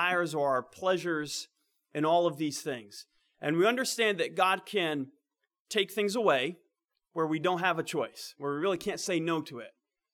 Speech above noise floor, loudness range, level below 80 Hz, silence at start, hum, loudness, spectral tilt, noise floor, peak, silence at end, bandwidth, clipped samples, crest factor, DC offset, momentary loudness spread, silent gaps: 54 dB; 3 LU; -78 dBFS; 0 s; none; -30 LUFS; -4 dB/octave; -84 dBFS; -12 dBFS; 0.45 s; 18.5 kHz; under 0.1%; 20 dB; under 0.1%; 14 LU; 5.60-5.65 s